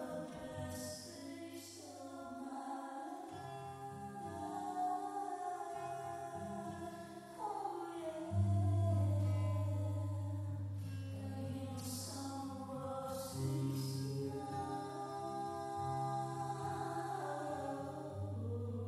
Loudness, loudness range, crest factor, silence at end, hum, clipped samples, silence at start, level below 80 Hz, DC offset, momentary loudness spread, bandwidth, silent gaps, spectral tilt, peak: -42 LUFS; 9 LU; 16 dB; 0 s; none; under 0.1%; 0 s; -72 dBFS; under 0.1%; 12 LU; 14 kHz; none; -6.5 dB/octave; -26 dBFS